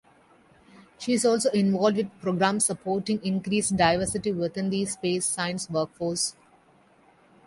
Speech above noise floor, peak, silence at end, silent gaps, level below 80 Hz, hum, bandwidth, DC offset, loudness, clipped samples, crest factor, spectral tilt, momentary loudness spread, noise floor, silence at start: 34 dB; -6 dBFS; 1.15 s; none; -58 dBFS; none; 11.5 kHz; under 0.1%; -26 LUFS; under 0.1%; 20 dB; -4 dB/octave; 7 LU; -59 dBFS; 0.8 s